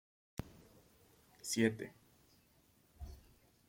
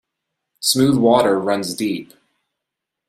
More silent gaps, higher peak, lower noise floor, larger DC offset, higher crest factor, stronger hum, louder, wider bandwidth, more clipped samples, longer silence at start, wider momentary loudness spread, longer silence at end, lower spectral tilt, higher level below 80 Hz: neither; second, -18 dBFS vs -2 dBFS; second, -71 dBFS vs -82 dBFS; neither; first, 26 dB vs 18 dB; neither; second, -40 LUFS vs -17 LUFS; about the same, 16.5 kHz vs 15 kHz; neither; second, 0.4 s vs 0.6 s; first, 24 LU vs 10 LU; second, 0.5 s vs 1.05 s; about the same, -4.5 dB/octave vs -4.5 dB/octave; second, -62 dBFS vs -56 dBFS